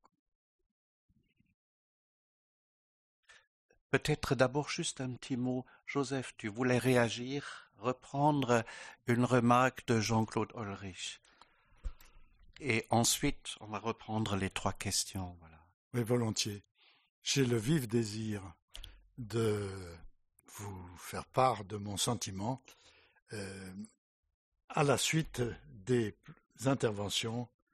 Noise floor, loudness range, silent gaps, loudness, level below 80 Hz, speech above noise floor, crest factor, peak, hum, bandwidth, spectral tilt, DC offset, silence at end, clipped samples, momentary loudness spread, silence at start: -65 dBFS; 6 LU; 15.74-15.91 s, 16.71-16.75 s, 17.09-17.22 s, 18.62-18.68 s, 23.22-23.26 s, 23.98-24.23 s, 24.34-24.52 s, 24.64-24.68 s; -34 LUFS; -58 dBFS; 31 dB; 24 dB; -12 dBFS; none; 13 kHz; -4.5 dB/octave; under 0.1%; 0.25 s; under 0.1%; 18 LU; 3.95 s